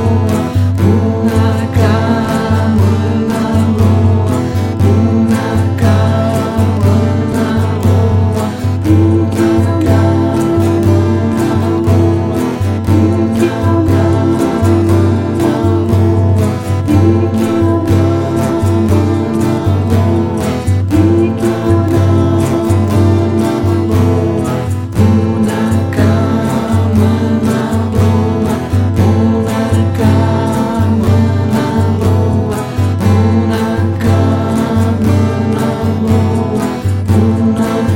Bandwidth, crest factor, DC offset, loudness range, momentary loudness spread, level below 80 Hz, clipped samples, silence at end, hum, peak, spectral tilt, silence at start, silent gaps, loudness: 16 kHz; 10 dB; under 0.1%; 1 LU; 3 LU; -32 dBFS; under 0.1%; 0 s; none; 0 dBFS; -8 dB/octave; 0 s; none; -12 LUFS